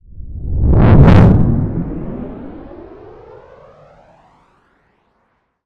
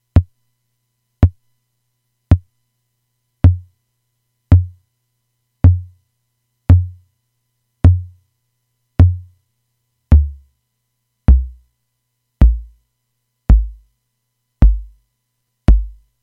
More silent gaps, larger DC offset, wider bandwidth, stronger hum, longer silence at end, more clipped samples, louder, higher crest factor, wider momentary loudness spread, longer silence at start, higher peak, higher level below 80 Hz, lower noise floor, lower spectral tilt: neither; neither; first, 5.8 kHz vs 3.6 kHz; second, none vs 60 Hz at -45 dBFS; first, 2.8 s vs 0.35 s; neither; first, -11 LUFS vs -16 LUFS; about the same, 14 dB vs 16 dB; first, 26 LU vs 15 LU; about the same, 0.2 s vs 0.15 s; about the same, 0 dBFS vs 0 dBFS; about the same, -20 dBFS vs -20 dBFS; second, -63 dBFS vs -72 dBFS; about the same, -10 dB/octave vs -10.5 dB/octave